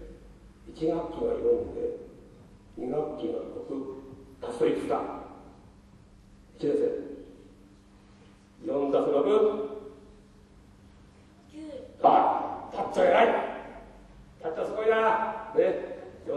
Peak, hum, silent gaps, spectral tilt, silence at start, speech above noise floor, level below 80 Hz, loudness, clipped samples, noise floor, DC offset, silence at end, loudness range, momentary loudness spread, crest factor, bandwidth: -8 dBFS; none; none; -6 dB/octave; 0 s; 29 dB; -56 dBFS; -28 LUFS; under 0.1%; -55 dBFS; under 0.1%; 0 s; 8 LU; 22 LU; 22 dB; 11 kHz